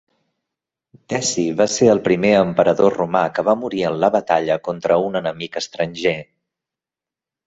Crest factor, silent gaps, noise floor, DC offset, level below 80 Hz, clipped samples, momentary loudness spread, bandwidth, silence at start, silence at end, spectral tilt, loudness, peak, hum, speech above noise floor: 18 dB; none; -89 dBFS; under 0.1%; -56 dBFS; under 0.1%; 9 LU; 8.2 kHz; 1.1 s; 1.25 s; -4.5 dB/octave; -18 LUFS; 0 dBFS; none; 71 dB